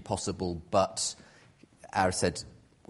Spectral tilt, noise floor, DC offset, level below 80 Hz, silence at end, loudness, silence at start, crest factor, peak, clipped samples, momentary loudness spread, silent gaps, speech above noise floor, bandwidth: -3.5 dB/octave; -59 dBFS; under 0.1%; -56 dBFS; 0.35 s; -30 LUFS; 0 s; 22 dB; -10 dBFS; under 0.1%; 14 LU; none; 28 dB; 11.5 kHz